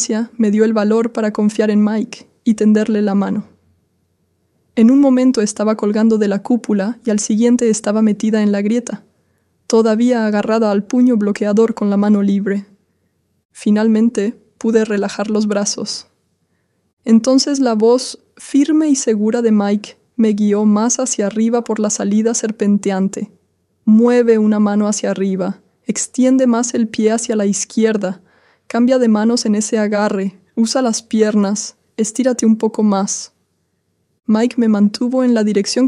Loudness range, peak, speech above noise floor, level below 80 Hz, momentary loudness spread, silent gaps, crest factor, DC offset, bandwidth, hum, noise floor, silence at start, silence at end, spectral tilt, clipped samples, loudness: 3 LU; -2 dBFS; 51 dB; -64 dBFS; 9 LU; 13.45-13.49 s, 16.93-16.97 s; 14 dB; under 0.1%; 11.5 kHz; none; -65 dBFS; 0 s; 0 s; -5 dB/octave; under 0.1%; -15 LUFS